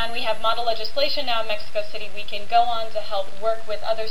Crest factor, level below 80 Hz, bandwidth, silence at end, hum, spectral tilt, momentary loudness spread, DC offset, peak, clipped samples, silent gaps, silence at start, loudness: 18 dB; -52 dBFS; 16 kHz; 0 s; none; -3.5 dB/octave; 9 LU; 10%; -6 dBFS; under 0.1%; none; 0 s; -25 LUFS